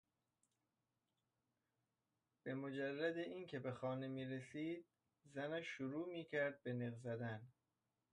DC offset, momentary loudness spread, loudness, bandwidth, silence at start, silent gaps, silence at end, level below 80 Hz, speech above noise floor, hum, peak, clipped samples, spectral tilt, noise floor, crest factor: under 0.1%; 7 LU; -47 LUFS; 10 kHz; 2.45 s; none; 0.65 s; -88 dBFS; over 43 dB; none; -30 dBFS; under 0.1%; -7 dB/octave; under -90 dBFS; 18 dB